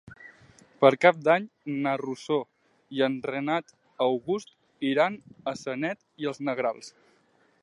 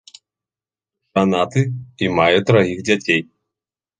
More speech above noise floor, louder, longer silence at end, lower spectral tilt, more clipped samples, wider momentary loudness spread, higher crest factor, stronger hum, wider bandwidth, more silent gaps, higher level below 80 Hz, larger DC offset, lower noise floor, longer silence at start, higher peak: second, 39 dB vs over 73 dB; second, -27 LUFS vs -17 LUFS; about the same, 0.75 s vs 0.75 s; about the same, -5.5 dB/octave vs -6 dB/octave; neither; first, 14 LU vs 8 LU; first, 24 dB vs 18 dB; neither; first, 11 kHz vs 9.6 kHz; neither; second, -74 dBFS vs -50 dBFS; neither; second, -65 dBFS vs under -90 dBFS; second, 0.05 s vs 1.15 s; about the same, -4 dBFS vs -2 dBFS